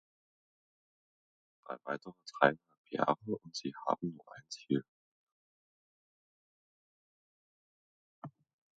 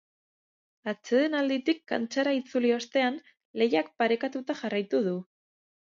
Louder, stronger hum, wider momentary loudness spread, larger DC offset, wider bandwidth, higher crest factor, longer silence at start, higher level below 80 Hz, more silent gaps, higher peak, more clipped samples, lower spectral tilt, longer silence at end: second, -36 LUFS vs -28 LUFS; neither; first, 23 LU vs 10 LU; neither; about the same, 7.4 kHz vs 7.6 kHz; first, 30 dB vs 18 dB; first, 1.7 s vs 0.85 s; about the same, -82 dBFS vs -82 dBFS; first, 2.78-2.84 s, 4.88-8.22 s vs 3.45-3.54 s; about the same, -10 dBFS vs -12 dBFS; neither; about the same, -4 dB/octave vs -5 dB/octave; second, 0.45 s vs 0.75 s